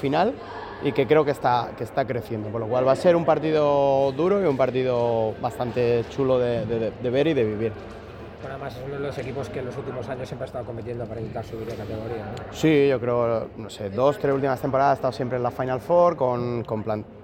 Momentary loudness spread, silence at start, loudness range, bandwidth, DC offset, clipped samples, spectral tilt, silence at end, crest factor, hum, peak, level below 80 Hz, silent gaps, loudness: 13 LU; 0 s; 10 LU; 16.5 kHz; under 0.1%; under 0.1%; -7 dB/octave; 0 s; 18 dB; none; -6 dBFS; -50 dBFS; none; -24 LUFS